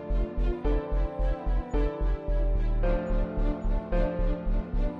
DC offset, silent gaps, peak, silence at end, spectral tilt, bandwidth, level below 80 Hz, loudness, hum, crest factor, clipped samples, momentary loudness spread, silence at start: under 0.1%; none; -14 dBFS; 0 s; -9.5 dB/octave; 4.5 kHz; -28 dBFS; -31 LUFS; none; 12 dB; under 0.1%; 3 LU; 0 s